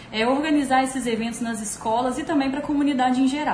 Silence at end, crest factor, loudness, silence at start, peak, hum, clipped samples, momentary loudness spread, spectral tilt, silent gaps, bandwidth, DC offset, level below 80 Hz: 0 s; 14 dB; -23 LUFS; 0 s; -8 dBFS; none; under 0.1%; 7 LU; -4 dB/octave; none; 11 kHz; under 0.1%; -52 dBFS